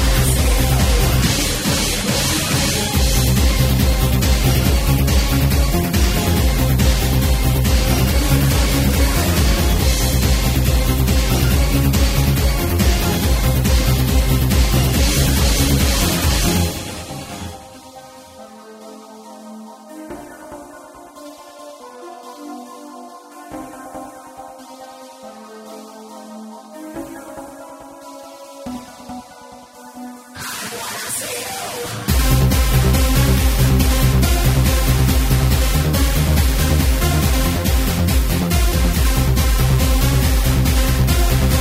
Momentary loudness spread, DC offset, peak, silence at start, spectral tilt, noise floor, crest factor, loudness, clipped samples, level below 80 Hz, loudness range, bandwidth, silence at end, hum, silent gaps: 21 LU; under 0.1%; -2 dBFS; 0 s; -4.5 dB/octave; -39 dBFS; 14 dB; -16 LUFS; under 0.1%; -20 dBFS; 19 LU; 16.5 kHz; 0 s; none; none